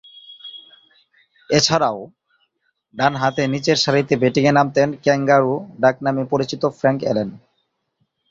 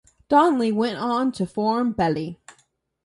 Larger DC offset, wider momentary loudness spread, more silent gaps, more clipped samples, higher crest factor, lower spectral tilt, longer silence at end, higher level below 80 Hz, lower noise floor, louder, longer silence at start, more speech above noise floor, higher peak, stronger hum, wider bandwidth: neither; first, 17 LU vs 7 LU; neither; neither; about the same, 18 dB vs 18 dB; second, -5 dB/octave vs -6.5 dB/octave; first, 0.95 s vs 0.7 s; about the same, -58 dBFS vs -56 dBFS; first, -70 dBFS vs -65 dBFS; first, -18 LUFS vs -22 LUFS; about the same, 0.3 s vs 0.3 s; first, 53 dB vs 44 dB; about the same, -2 dBFS vs -4 dBFS; neither; second, 7.8 kHz vs 11.5 kHz